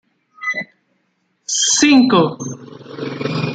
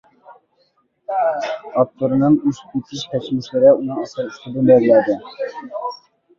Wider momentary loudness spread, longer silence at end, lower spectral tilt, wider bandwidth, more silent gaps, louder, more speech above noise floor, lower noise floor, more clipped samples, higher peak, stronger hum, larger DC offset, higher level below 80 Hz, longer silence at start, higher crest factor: first, 23 LU vs 15 LU; second, 0 s vs 0.45 s; second, -3 dB/octave vs -7 dB/octave; first, 9.4 kHz vs 7.4 kHz; neither; first, -15 LUFS vs -18 LUFS; first, 52 dB vs 45 dB; about the same, -65 dBFS vs -63 dBFS; neither; about the same, 0 dBFS vs -2 dBFS; neither; neither; about the same, -60 dBFS vs -60 dBFS; about the same, 0.4 s vs 0.3 s; about the same, 18 dB vs 16 dB